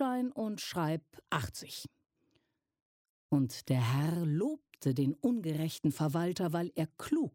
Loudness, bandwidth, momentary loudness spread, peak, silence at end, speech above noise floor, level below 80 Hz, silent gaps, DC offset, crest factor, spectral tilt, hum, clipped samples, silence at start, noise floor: -34 LUFS; 16.5 kHz; 7 LU; -18 dBFS; 0.05 s; 44 dB; -68 dBFS; 2.82-3.29 s; under 0.1%; 16 dB; -6.5 dB/octave; none; under 0.1%; 0 s; -78 dBFS